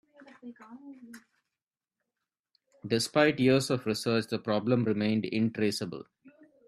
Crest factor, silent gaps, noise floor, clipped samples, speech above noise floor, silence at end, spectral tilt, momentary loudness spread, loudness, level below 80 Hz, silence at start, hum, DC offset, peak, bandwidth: 22 dB; 2.39-2.44 s; under -90 dBFS; under 0.1%; over 61 dB; 0.4 s; -5.5 dB/octave; 24 LU; -28 LUFS; -70 dBFS; 0.45 s; none; under 0.1%; -8 dBFS; 13.5 kHz